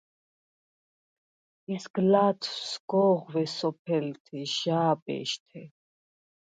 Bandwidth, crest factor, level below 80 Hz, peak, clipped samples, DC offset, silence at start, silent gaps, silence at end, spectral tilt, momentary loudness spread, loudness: 9.2 kHz; 20 dB; -78 dBFS; -10 dBFS; under 0.1%; under 0.1%; 1.7 s; 1.90-1.94 s, 2.80-2.88 s, 3.79-3.85 s, 4.20-4.25 s, 5.02-5.06 s, 5.40-5.46 s; 0.8 s; -5.5 dB/octave; 13 LU; -28 LUFS